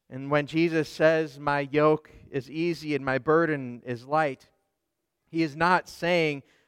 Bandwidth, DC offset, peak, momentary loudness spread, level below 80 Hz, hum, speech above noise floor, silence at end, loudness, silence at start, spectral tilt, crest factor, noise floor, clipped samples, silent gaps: 14.5 kHz; under 0.1%; -8 dBFS; 11 LU; -62 dBFS; none; 55 dB; 0.25 s; -26 LUFS; 0.1 s; -6.5 dB/octave; 18 dB; -81 dBFS; under 0.1%; none